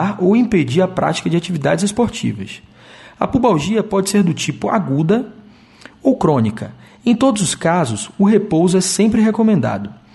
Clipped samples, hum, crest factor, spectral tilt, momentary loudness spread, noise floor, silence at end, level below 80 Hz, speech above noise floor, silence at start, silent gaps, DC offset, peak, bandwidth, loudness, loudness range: under 0.1%; none; 14 dB; -5.5 dB/octave; 9 LU; -43 dBFS; 0.2 s; -46 dBFS; 27 dB; 0 s; none; under 0.1%; -2 dBFS; 11.5 kHz; -16 LUFS; 3 LU